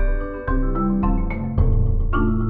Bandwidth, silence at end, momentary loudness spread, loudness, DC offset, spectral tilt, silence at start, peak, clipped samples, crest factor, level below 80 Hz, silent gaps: 3.1 kHz; 0 s; 5 LU; -22 LUFS; under 0.1%; -12 dB/octave; 0 s; -6 dBFS; under 0.1%; 12 dB; -20 dBFS; none